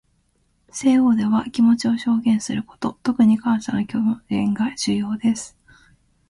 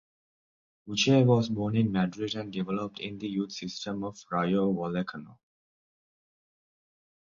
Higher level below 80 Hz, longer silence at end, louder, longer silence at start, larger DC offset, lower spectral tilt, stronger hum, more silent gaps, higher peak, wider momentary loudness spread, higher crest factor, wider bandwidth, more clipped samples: first, -56 dBFS vs -64 dBFS; second, 0.8 s vs 1.95 s; first, -20 LUFS vs -29 LUFS; about the same, 0.75 s vs 0.85 s; neither; about the same, -5.5 dB/octave vs -6 dB/octave; neither; neither; first, -6 dBFS vs -12 dBFS; second, 9 LU vs 13 LU; about the same, 14 dB vs 18 dB; first, 11.5 kHz vs 7.6 kHz; neither